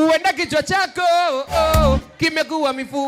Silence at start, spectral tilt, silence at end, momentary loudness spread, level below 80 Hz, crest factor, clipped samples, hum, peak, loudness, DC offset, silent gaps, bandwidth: 0 s; -4.5 dB/octave; 0 s; 5 LU; -28 dBFS; 14 dB; under 0.1%; none; -4 dBFS; -18 LUFS; under 0.1%; none; 16.5 kHz